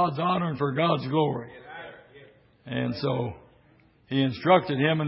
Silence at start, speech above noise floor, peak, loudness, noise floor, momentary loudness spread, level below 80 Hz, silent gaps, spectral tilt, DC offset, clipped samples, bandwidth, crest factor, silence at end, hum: 0 s; 34 dB; -6 dBFS; -26 LUFS; -59 dBFS; 20 LU; -60 dBFS; none; -11 dB/octave; under 0.1%; under 0.1%; 5.8 kHz; 20 dB; 0 s; none